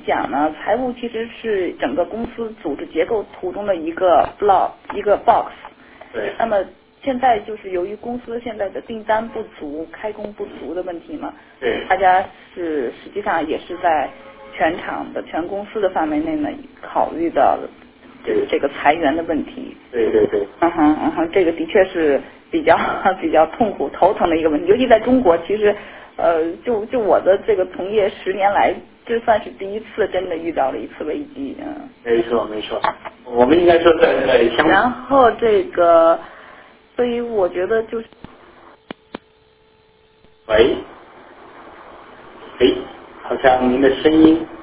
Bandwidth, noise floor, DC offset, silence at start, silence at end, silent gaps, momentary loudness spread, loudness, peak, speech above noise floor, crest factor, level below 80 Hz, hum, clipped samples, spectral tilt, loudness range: 4 kHz; -53 dBFS; under 0.1%; 0 s; 0 s; none; 15 LU; -18 LUFS; 0 dBFS; 36 dB; 18 dB; -46 dBFS; none; under 0.1%; -9 dB/octave; 8 LU